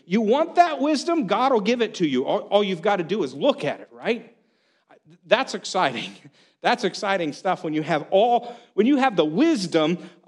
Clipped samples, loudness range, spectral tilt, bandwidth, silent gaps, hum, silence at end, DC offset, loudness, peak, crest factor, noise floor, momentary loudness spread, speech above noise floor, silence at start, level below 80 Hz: under 0.1%; 4 LU; -5 dB/octave; 11 kHz; none; none; 0.2 s; under 0.1%; -22 LUFS; 0 dBFS; 22 dB; -65 dBFS; 8 LU; 43 dB; 0.1 s; -76 dBFS